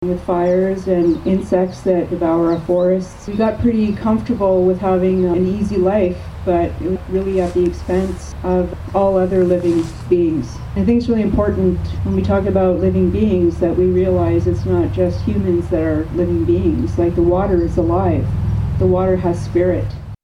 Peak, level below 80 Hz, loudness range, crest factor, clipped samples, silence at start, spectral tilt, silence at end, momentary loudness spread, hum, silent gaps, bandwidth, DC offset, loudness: -2 dBFS; -30 dBFS; 2 LU; 14 dB; under 0.1%; 0 s; -9 dB/octave; 0.1 s; 5 LU; none; none; 11 kHz; under 0.1%; -17 LUFS